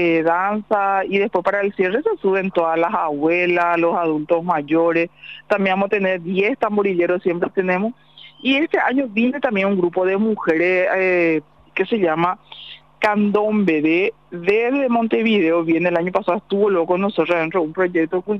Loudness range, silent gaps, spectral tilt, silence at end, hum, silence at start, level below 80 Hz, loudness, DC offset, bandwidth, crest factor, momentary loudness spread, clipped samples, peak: 2 LU; none; -7.5 dB/octave; 0 s; none; 0 s; -62 dBFS; -18 LUFS; 0.2%; 7.2 kHz; 12 dB; 5 LU; under 0.1%; -6 dBFS